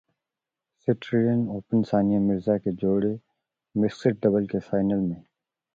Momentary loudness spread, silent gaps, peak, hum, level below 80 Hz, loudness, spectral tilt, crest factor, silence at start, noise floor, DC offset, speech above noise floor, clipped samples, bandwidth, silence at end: 8 LU; none; -8 dBFS; none; -58 dBFS; -25 LUFS; -9 dB/octave; 18 dB; 0.85 s; -88 dBFS; under 0.1%; 64 dB; under 0.1%; 7.2 kHz; 0.55 s